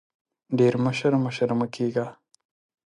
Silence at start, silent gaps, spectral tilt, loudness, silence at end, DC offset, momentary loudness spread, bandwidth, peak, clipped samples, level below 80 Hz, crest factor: 0.5 s; none; -7 dB/octave; -24 LUFS; 0.75 s; under 0.1%; 9 LU; 11 kHz; -8 dBFS; under 0.1%; -68 dBFS; 18 dB